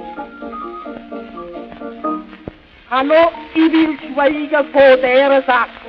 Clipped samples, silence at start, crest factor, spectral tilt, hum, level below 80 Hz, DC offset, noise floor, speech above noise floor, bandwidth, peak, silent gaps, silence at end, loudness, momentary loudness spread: under 0.1%; 0 s; 16 dB; -6.5 dB/octave; none; -50 dBFS; under 0.1%; -36 dBFS; 23 dB; 5.4 kHz; 0 dBFS; none; 0 s; -14 LUFS; 20 LU